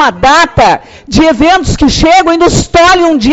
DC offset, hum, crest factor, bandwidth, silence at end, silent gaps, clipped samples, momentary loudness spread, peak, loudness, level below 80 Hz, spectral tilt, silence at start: under 0.1%; none; 6 dB; 8.2 kHz; 0 s; none; 0.2%; 4 LU; 0 dBFS; -7 LUFS; -22 dBFS; -4.5 dB/octave; 0 s